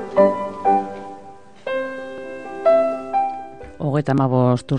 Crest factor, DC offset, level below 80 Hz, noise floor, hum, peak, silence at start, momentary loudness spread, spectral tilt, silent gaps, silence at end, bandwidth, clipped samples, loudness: 18 dB; 0.6%; -54 dBFS; -42 dBFS; none; -2 dBFS; 0 s; 17 LU; -8.5 dB/octave; none; 0 s; 9.8 kHz; under 0.1%; -20 LUFS